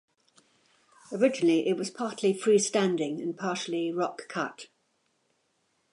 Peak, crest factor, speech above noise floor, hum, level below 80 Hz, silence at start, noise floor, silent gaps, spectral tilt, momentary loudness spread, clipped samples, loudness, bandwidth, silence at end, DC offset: -12 dBFS; 18 dB; 46 dB; none; -84 dBFS; 1.1 s; -74 dBFS; none; -4.5 dB/octave; 10 LU; under 0.1%; -28 LUFS; 11.5 kHz; 1.3 s; under 0.1%